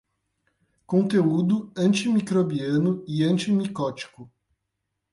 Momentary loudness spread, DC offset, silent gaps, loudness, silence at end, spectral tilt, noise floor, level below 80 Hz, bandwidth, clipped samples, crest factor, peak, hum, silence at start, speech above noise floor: 8 LU; under 0.1%; none; -23 LUFS; 0.85 s; -6.5 dB/octave; -80 dBFS; -64 dBFS; 11.5 kHz; under 0.1%; 14 dB; -10 dBFS; none; 0.9 s; 57 dB